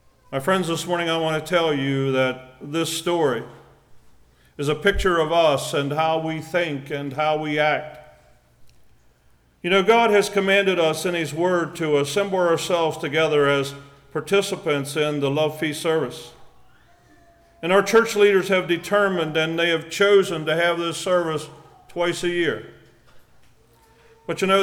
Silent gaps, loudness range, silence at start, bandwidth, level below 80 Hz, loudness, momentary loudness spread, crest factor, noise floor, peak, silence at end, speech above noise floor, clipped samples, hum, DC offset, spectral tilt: none; 6 LU; 0.3 s; 17.5 kHz; -46 dBFS; -21 LUFS; 12 LU; 16 dB; -58 dBFS; -6 dBFS; 0 s; 37 dB; under 0.1%; none; under 0.1%; -4.5 dB/octave